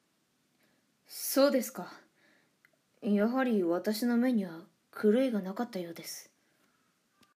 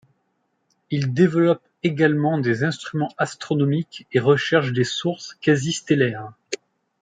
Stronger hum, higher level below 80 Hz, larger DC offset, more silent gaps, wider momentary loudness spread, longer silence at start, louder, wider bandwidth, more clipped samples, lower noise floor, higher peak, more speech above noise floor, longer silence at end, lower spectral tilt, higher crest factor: neither; second, -88 dBFS vs -64 dBFS; neither; neither; first, 18 LU vs 9 LU; first, 1.1 s vs 0.9 s; second, -31 LUFS vs -21 LUFS; first, 15.5 kHz vs 9.4 kHz; neither; about the same, -74 dBFS vs -71 dBFS; second, -14 dBFS vs -2 dBFS; second, 45 dB vs 50 dB; first, 1.15 s vs 0.45 s; about the same, -5 dB/octave vs -6 dB/octave; about the same, 18 dB vs 18 dB